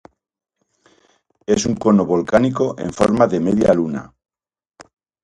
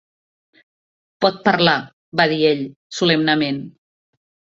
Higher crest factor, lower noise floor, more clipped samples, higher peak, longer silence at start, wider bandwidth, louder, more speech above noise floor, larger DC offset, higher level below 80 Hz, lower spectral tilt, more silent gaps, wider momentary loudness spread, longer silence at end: about the same, 18 dB vs 20 dB; second, -59 dBFS vs under -90 dBFS; neither; about the same, 0 dBFS vs 0 dBFS; first, 1.5 s vs 1.2 s; first, 11 kHz vs 7.8 kHz; about the same, -17 LUFS vs -18 LUFS; second, 43 dB vs over 72 dB; neither; first, -48 dBFS vs -60 dBFS; about the same, -6 dB/octave vs -5 dB/octave; second, none vs 1.93-2.12 s, 2.76-2.90 s; second, 7 LU vs 11 LU; first, 1.15 s vs 0.9 s